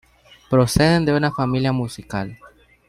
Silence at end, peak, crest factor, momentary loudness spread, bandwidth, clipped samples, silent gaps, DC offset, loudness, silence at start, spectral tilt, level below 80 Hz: 0.4 s; -2 dBFS; 18 dB; 13 LU; 15.5 kHz; under 0.1%; none; under 0.1%; -19 LUFS; 0.5 s; -6 dB/octave; -40 dBFS